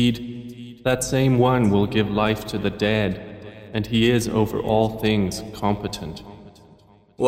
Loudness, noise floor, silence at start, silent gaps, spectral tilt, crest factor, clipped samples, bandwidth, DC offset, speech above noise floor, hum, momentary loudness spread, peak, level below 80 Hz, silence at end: -22 LUFS; -52 dBFS; 0 s; none; -6 dB/octave; 18 dB; under 0.1%; 16 kHz; under 0.1%; 31 dB; none; 17 LU; -4 dBFS; -44 dBFS; 0 s